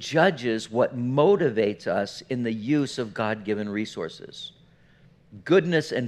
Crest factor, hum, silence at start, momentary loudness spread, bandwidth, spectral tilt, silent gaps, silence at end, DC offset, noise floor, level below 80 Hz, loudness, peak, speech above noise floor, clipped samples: 22 dB; none; 0 s; 15 LU; 12 kHz; -6 dB/octave; none; 0 s; under 0.1%; -56 dBFS; -66 dBFS; -25 LUFS; -4 dBFS; 32 dB; under 0.1%